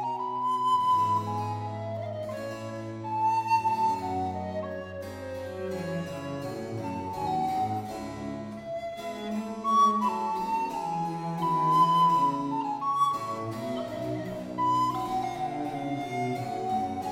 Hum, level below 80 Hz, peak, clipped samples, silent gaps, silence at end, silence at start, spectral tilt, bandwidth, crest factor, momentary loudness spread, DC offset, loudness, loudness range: none; -62 dBFS; -12 dBFS; under 0.1%; none; 0 s; 0 s; -6 dB/octave; 16 kHz; 18 dB; 13 LU; under 0.1%; -29 LUFS; 7 LU